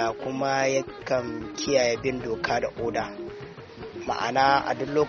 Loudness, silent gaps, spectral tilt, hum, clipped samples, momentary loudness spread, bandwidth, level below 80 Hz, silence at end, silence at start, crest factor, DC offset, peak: -26 LUFS; none; -3 dB/octave; none; under 0.1%; 16 LU; 7 kHz; -54 dBFS; 0 s; 0 s; 20 dB; under 0.1%; -6 dBFS